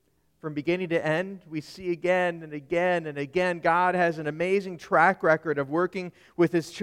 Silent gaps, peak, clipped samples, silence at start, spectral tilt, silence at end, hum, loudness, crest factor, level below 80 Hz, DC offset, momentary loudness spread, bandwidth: none; -6 dBFS; under 0.1%; 0.45 s; -6.5 dB/octave; 0 s; none; -26 LUFS; 20 dB; -64 dBFS; under 0.1%; 13 LU; 13 kHz